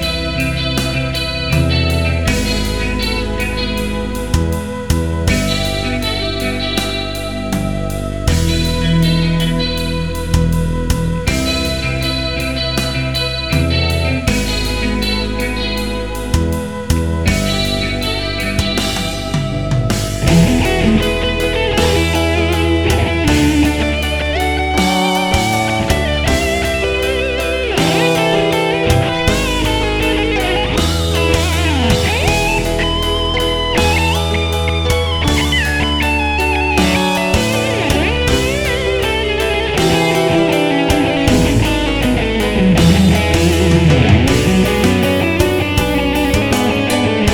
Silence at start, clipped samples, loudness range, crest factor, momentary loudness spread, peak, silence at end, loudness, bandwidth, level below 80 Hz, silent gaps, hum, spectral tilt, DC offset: 0 s; under 0.1%; 5 LU; 14 dB; 6 LU; 0 dBFS; 0 s; -15 LUFS; 19.5 kHz; -22 dBFS; none; none; -5 dB/octave; under 0.1%